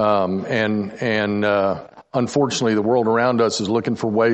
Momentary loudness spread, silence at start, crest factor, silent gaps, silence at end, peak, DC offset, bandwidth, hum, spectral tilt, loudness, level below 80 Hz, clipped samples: 5 LU; 0 s; 14 dB; none; 0 s; -6 dBFS; under 0.1%; 8.8 kHz; none; -5.5 dB/octave; -20 LUFS; -62 dBFS; under 0.1%